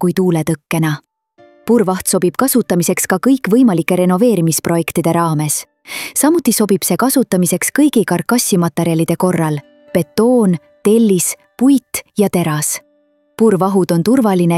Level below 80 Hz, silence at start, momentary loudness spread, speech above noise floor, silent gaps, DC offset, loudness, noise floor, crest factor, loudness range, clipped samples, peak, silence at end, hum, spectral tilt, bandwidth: -54 dBFS; 0 s; 7 LU; 43 dB; none; under 0.1%; -14 LUFS; -57 dBFS; 12 dB; 2 LU; under 0.1%; -2 dBFS; 0 s; none; -5 dB/octave; 16.5 kHz